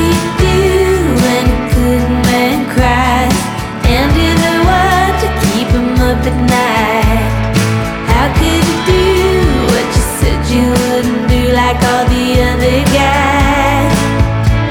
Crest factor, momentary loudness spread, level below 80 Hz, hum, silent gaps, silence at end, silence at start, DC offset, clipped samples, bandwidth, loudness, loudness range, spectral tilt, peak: 10 dB; 3 LU; -18 dBFS; none; none; 0 s; 0 s; under 0.1%; under 0.1%; 19 kHz; -11 LUFS; 1 LU; -5.5 dB/octave; 0 dBFS